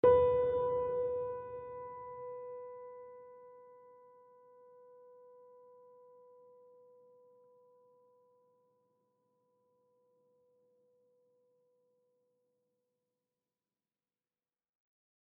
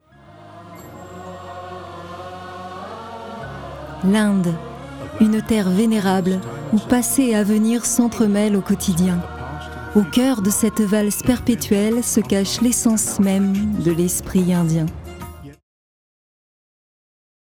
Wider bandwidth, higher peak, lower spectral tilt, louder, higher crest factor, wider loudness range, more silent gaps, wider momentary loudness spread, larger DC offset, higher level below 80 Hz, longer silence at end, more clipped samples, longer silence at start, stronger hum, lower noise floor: second, 3.7 kHz vs 18 kHz; second, -16 dBFS vs -4 dBFS; about the same, -6 dB/octave vs -5 dB/octave; second, -35 LUFS vs -18 LUFS; first, 24 dB vs 16 dB; first, 25 LU vs 7 LU; neither; first, 29 LU vs 17 LU; neither; second, -68 dBFS vs -44 dBFS; first, 11.6 s vs 1.95 s; neither; second, 0.05 s vs 0.3 s; neither; first, under -90 dBFS vs -44 dBFS